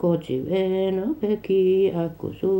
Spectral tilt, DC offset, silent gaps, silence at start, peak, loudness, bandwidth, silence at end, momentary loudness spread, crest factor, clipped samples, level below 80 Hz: -9 dB/octave; under 0.1%; none; 0 s; -10 dBFS; -23 LUFS; 16 kHz; 0 s; 8 LU; 12 dB; under 0.1%; -54 dBFS